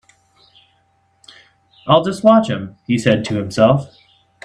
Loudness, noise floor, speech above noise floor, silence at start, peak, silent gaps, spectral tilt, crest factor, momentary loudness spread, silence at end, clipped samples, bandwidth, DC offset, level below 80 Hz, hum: -16 LUFS; -60 dBFS; 45 dB; 1.85 s; 0 dBFS; none; -6.5 dB/octave; 18 dB; 12 LU; 0.6 s; under 0.1%; 11 kHz; under 0.1%; -54 dBFS; none